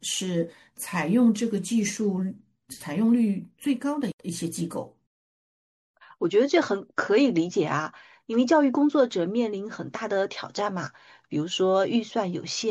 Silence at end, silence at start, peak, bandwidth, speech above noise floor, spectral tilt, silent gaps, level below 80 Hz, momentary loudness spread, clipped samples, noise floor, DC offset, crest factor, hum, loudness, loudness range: 0 s; 0 s; -8 dBFS; 12.5 kHz; over 65 dB; -5 dB/octave; 4.13-4.18 s, 5.07-5.94 s; -72 dBFS; 12 LU; under 0.1%; under -90 dBFS; under 0.1%; 18 dB; none; -26 LUFS; 5 LU